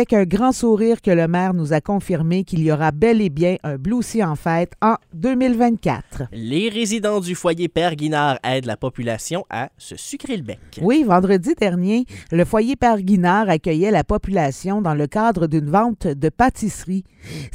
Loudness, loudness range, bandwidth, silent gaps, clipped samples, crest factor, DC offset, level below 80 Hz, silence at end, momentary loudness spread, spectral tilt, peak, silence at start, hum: -19 LUFS; 4 LU; 16 kHz; none; under 0.1%; 18 dB; under 0.1%; -40 dBFS; 0.05 s; 10 LU; -6.5 dB/octave; -2 dBFS; 0 s; none